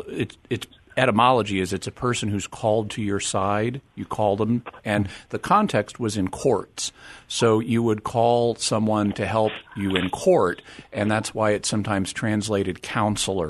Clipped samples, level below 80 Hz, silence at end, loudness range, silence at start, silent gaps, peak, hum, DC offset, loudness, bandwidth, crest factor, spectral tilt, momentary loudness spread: under 0.1%; -52 dBFS; 0 s; 2 LU; 0 s; none; -2 dBFS; none; under 0.1%; -23 LUFS; 12.5 kHz; 20 dB; -5 dB/octave; 10 LU